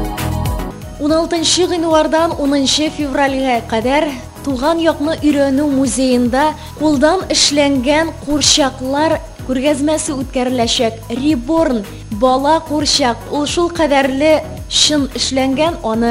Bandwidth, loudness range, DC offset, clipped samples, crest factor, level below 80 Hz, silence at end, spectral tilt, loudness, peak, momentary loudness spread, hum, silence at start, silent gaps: 16 kHz; 2 LU; under 0.1%; under 0.1%; 14 dB; -32 dBFS; 0 s; -3.5 dB/octave; -14 LUFS; 0 dBFS; 8 LU; none; 0 s; none